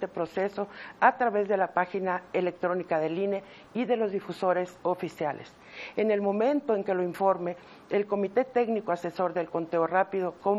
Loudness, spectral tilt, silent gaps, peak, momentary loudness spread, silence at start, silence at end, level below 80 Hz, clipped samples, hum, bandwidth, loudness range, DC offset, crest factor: -29 LUFS; -7 dB/octave; none; -6 dBFS; 8 LU; 0 s; 0 s; -72 dBFS; under 0.1%; none; 13 kHz; 2 LU; under 0.1%; 22 dB